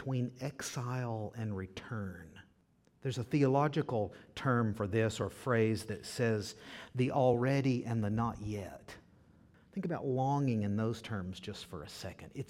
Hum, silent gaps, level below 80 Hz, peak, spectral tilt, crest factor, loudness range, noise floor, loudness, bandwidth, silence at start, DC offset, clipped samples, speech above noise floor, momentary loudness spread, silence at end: none; none; -64 dBFS; -16 dBFS; -6.5 dB/octave; 18 dB; 4 LU; -70 dBFS; -35 LUFS; 15.5 kHz; 0 s; under 0.1%; under 0.1%; 35 dB; 15 LU; 0.05 s